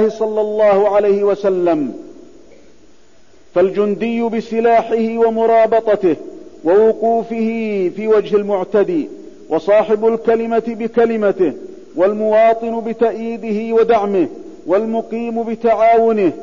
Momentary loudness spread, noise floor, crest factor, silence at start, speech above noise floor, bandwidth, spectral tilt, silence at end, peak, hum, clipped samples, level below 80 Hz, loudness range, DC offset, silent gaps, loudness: 9 LU; -50 dBFS; 10 dB; 0 s; 36 dB; 7.4 kHz; -7.5 dB/octave; 0 s; -4 dBFS; none; under 0.1%; -54 dBFS; 3 LU; 0.8%; none; -15 LUFS